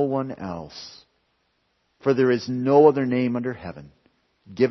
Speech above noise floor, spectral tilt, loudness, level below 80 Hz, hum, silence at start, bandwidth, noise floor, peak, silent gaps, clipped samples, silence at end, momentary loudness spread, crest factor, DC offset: 48 dB; -7.5 dB/octave; -22 LUFS; -62 dBFS; none; 0 s; 6.2 kHz; -70 dBFS; -4 dBFS; none; under 0.1%; 0 s; 23 LU; 20 dB; under 0.1%